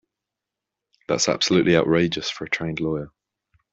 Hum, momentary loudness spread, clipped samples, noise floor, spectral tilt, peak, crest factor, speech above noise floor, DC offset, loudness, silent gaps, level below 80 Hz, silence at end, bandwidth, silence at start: none; 9 LU; under 0.1%; -86 dBFS; -4 dB/octave; -4 dBFS; 20 dB; 64 dB; under 0.1%; -22 LUFS; none; -56 dBFS; 0.65 s; 8 kHz; 1.1 s